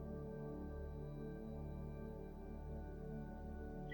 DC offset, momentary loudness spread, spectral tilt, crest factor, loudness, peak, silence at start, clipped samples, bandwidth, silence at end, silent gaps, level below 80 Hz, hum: under 0.1%; 2 LU; -9.5 dB/octave; 12 dB; -50 LUFS; -38 dBFS; 0 s; under 0.1%; 19 kHz; 0 s; none; -52 dBFS; none